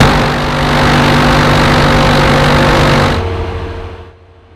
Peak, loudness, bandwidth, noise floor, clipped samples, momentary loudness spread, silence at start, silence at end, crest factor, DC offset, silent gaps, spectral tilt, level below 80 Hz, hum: 0 dBFS; -9 LUFS; 15.5 kHz; -38 dBFS; 0.2%; 12 LU; 0 s; 0.45 s; 10 dB; under 0.1%; none; -5.5 dB/octave; -20 dBFS; none